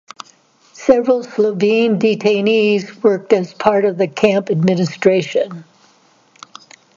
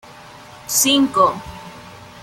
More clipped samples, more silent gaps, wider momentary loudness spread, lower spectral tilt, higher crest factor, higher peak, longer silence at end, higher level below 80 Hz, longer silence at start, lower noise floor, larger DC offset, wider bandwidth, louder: neither; neither; second, 7 LU vs 23 LU; first, -6.5 dB/octave vs -2 dB/octave; about the same, 16 dB vs 18 dB; about the same, 0 dBFS vs -2 dBFS; first, 1.35 s vs 0.05 s; second, -60 dBFS vs -50 dBFS; first, 0.8 s vs 0.25 s; first, -53 dBFS vs -40 dBFS; neither; second, 7.6 kHz vs 16.5 kHz; about the same, -15 LUFS vs -15 LUFS